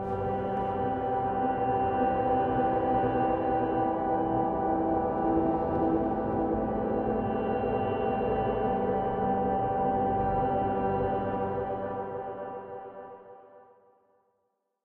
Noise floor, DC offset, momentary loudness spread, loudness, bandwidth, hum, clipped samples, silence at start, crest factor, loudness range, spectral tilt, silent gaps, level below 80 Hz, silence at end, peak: -78 dBFS; under 0.1%; 8 LU; -29 LUFS; 4.2 kHz; none; under 0.1%; 0 s; 16 dB; 6 LU; -10.5 dB/octave; none; -48 dBFS; 1.25 s; -14 dBFS